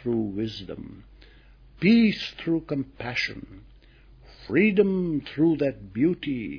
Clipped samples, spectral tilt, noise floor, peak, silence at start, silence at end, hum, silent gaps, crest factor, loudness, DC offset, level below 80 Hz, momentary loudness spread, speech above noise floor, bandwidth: under 0.1%; -7.5 dB/octave; -52 dBFS; -8 dBFS; 0 s; 0 s; none; none; 18 dB; -25 LUFS; under 0.1%; -52 dBFS; 14 LU; 27 dB; 5.4 kHz